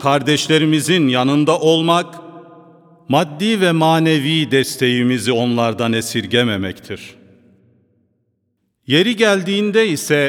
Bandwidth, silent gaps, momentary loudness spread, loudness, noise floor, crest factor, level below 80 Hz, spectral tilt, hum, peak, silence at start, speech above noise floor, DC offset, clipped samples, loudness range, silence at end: 18 kHz; none; 6 LU; -15 LUFS; -68 dBFS; 16 dB; -62 dBFS; -5 dB/octave; none; 0 dBFS; 0 s; 53 dB; under 0.1%; under 0.1%; 5 LU; 0 s